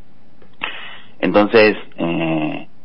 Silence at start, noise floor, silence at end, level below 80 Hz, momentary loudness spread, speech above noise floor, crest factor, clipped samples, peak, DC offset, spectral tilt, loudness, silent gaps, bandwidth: 0.6 s; -50 dBFS; 0.2 s; -56 dBFS; 15 LU; 34 dB; 18 dB; under 0.1%; 0 dBFS; 3%; -10.5 dB/octave; -17 LUFS; none; 5.8 kHz